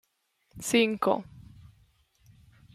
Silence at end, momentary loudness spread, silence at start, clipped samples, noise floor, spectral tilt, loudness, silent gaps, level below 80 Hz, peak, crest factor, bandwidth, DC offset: 1.35 s; 15 LU; 0.55 s; under 0.1%; -73 dBFS; -3.5 dB/octave; -27 LUFS; none; -64 dBFS; -10 dBFS; 22 dB; 15.5 kHz; under 0.1%